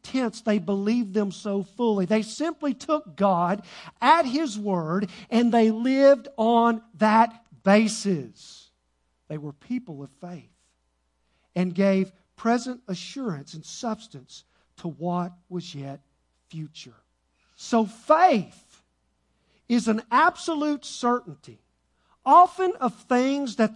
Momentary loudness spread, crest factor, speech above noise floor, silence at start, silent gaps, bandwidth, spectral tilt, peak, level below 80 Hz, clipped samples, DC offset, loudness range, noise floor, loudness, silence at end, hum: 20 LU; 20 dB; 48 dB; 0.05 s; none; 11 kHz; -5.5 dB/octave; -4 dBFS; -70 dBFS; under 0.1%; under 0.1%; 13 LU; -72 dBFS; -24 LUFS; 0 s; none